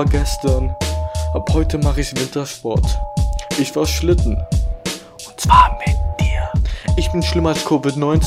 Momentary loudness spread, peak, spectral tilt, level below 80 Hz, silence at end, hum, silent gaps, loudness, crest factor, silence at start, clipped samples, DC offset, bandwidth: 7 LU; 0 dBFS; -5.5 dB/octave; -20 dBFS; 0 s; none; none; -18 LUFS; 16 dB; 0 s; under 0.1%; under 0.1%; 15.5 kHz